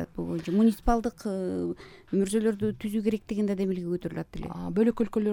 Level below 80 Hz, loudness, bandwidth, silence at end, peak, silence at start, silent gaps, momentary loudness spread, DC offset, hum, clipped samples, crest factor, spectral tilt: -44 dBFS; -28 LUFS; 18 kHz; 0 s; -10 dBFS; 0 s; none; 11 LU; under 0.1%; none; under 0.1%; 18 dB; -7 dB/octave